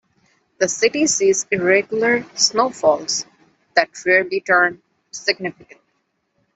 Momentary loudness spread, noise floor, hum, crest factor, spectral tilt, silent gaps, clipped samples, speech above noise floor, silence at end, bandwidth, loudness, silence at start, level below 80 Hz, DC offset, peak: 8 LU; -69 dBFS; none; 18 dB; -2 dB/octave; none; under 0.1%; 51 dB; 1.05 s; 8.4 kHz; -18 LUFS; 0.6 s; -64 dBFS; under 0.1%; -2 dBFS